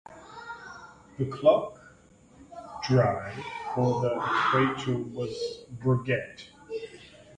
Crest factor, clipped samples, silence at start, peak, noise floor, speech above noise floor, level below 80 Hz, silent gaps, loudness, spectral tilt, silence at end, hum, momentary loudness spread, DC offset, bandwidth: 20 dB; under 0.1%; 0.1 s; -8 dBFS; -56 dBFS; 29 dB; -60 dBFS; none; -28 LUFS; -7 dB/octave; 0 s; none; 22 LU; under 0.1%; 9.6 kHz